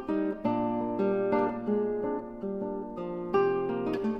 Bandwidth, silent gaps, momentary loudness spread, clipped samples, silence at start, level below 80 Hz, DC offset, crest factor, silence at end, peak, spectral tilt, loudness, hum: 5.8 kHz; none; 9 LU; under 0.1%; 0 s; -56 dBFS; under 0.1%; 16 dB; 0 s; -14 dBFS; -9 dB/octave; -30 LUFS; none